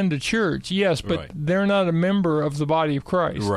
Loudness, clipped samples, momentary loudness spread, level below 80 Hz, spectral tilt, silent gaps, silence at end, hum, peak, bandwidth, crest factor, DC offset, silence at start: -22 LUFS; under 0.1%; 4 LU; -48 dBFS; -6 dB/octave; none; 0 s; none; -10 dBFS; 13 kHz; 12 dB; under 0.1%; 0 s